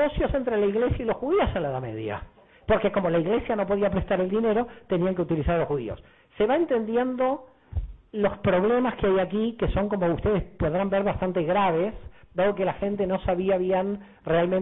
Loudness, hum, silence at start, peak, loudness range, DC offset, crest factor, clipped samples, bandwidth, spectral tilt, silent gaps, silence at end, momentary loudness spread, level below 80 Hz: -25 LUFS; none; 0 s; -14 dBFS; 2 LU; under 0.1%; 12 dB; under 0.1%; 4 kHz; -11 dB/octave; none; 0 s; 10 LU; -40 dBFS